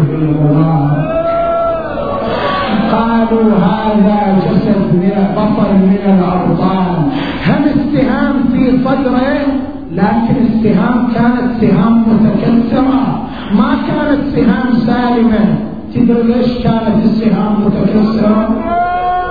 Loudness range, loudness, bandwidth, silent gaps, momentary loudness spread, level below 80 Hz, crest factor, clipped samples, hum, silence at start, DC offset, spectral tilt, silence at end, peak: 2 LU; -12 LUFS; 5 kHz; none; 4 LU; -32 dBFS; 10 dB; under 0.1%; none; 0 s; 2%; -10.5 dB/octave; 0 s; 0 dBFS